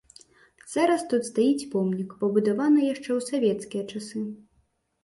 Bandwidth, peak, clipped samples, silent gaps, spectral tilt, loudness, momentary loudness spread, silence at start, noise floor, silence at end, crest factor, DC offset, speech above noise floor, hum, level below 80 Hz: 11.5 kHz; -10 dBFS; under 0.1%; none; -6 dB/octave; -26 LUFS; 11 LU; 0.65 s; -69 dBFS; 0.7 s; 16 dB; under 0.1%; 44 dB; none; -70 dBFS